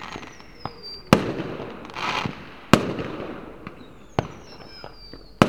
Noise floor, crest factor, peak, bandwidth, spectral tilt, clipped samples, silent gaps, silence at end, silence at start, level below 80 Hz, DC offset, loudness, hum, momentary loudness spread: -45 dBFS; 26 dB; 0 dBFS; 19 kHz; -5.5 dB/octave; under 0.1%; none; 0 s; 0 s; -48 dBFS; 0.4%; -26 LUFS; none; 21 LU